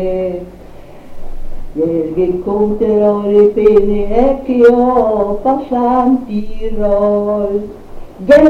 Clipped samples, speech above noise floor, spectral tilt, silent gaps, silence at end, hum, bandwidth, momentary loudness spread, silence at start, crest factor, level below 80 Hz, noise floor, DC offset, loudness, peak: under 0.1%; 21 dB; -8.5 dB/octave; none; 0 s; none; 7.6 kHz; 14 LU; 0 s; 12 dB; -28 dBFS; -32 dBFS; under 0.1%; -13 LUFS; 0 dBFS